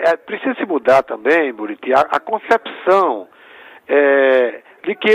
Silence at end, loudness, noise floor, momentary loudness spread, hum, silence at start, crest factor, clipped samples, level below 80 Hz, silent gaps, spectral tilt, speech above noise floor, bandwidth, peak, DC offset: 0 s; -16 LUFS; -42 dBFS; 10 LU; none; 0 s; 14 dB; under 0.1%; -62 dBFS; none; -5 dB/octave; 26 dB; 11.5 kHz; -2 dBFS; under 0.1%